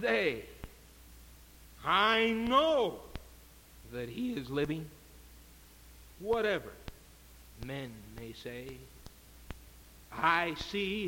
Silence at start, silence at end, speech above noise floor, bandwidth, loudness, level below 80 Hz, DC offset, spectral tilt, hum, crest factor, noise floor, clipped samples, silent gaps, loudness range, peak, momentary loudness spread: 0 s; 0 s; 24 dB; 17 kHz; -32 LUFS; -56 dBFS; under 0.1%; -4.5 dB/octave; none; 22 dB; -56 dBFS; under 0.1%; none; 10 LU; -14 dBFS; 24 LU